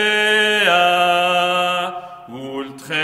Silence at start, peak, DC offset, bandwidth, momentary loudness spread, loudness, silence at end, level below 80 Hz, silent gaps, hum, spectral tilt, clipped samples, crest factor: 0 s; -2 dBFS; under 0.1%; 15.5 kHz; 17 LU; -15 LUFS; 0 s; -64 dBFS; none; none; -2.5 dB/octave; under 0.1%; 16 dB